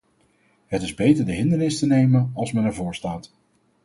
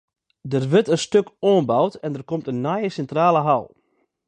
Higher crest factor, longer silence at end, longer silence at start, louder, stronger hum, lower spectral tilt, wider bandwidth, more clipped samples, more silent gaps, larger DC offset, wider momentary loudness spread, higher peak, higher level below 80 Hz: about the same, 18 dB vs 16 dB; about the same, 0.6 s vs 0.6 s; first, 0.7 s vs 0.45 s; about the same, -22 LUFS vs -21 LUFS; neither; about the same, -7 dB/octave vs -6.5 dB/octave; first, 11.5 kHz vs 9.8 kHz; neither; neither; neither; first, 12 LU vs 9 LU; about the same, -6 dBFS vs -4 dBFS; first, -50 dBFS vs -64 dBFS